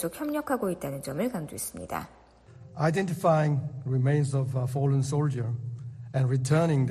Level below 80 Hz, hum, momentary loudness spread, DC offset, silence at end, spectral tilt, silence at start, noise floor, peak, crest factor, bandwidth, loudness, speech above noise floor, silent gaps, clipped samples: -60 dBFS; none; 12 LU; under 0.1%; 0 s; -7 dB/octave; 0 s; -51 dBFS; -10 dBFS; 18 dB; 13.5 kHz; -28 LUFS; 24 dB; none; under 0.1%